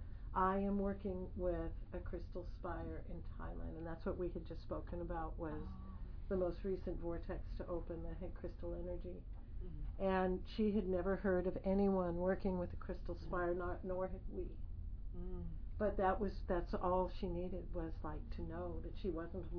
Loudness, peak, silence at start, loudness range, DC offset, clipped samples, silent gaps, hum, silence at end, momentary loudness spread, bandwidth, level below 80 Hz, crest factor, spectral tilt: -43 LUFS; -24 dBFS; 0 s; 8 LU; under 0.1%; under 0.1%; none; none; 0 s; 13 LU; 5.4 kHz; -48 dBFS; 18 dB; -7.5 dB/octave